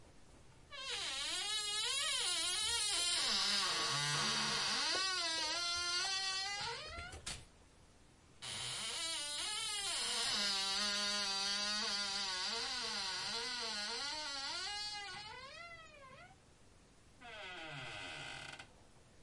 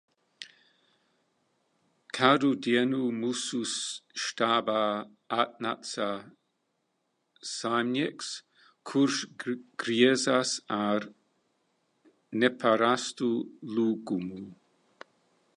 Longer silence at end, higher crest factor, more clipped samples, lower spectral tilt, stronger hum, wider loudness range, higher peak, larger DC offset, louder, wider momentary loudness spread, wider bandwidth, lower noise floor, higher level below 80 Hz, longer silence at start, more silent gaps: second, 0 s vs 1.05 s; second, 18 dB vs 26 dB; neither; second, 0 dB/octave vs -3.5 dB/octave; neither; first, 13 LU vs 5 LU; second, -22 dBFS vs -6 dBFS; neither; second, -37 LUFS vs -29 LUFS; about the same, 15 LU vs 16 LU; about the same, 11.5 kHz vs 11.5 kHz; second, -64 dBFS vs -78 dBFS; first, -68 dBFS vs -78 dBFS; second, 0 s vs 0.4 s; neither